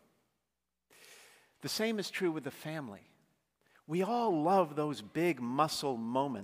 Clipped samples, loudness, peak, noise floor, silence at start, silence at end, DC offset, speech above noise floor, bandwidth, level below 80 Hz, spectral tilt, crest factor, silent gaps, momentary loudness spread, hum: under 0.1%; -34 LUFS; -16 dBFS; -88 dBFS; 1.05 s; 0 s; under 0.1%; 54 dB; 15.5 kHz; -80 dBFS; -5 dB/octave; 20 dB; none; 12 LU; none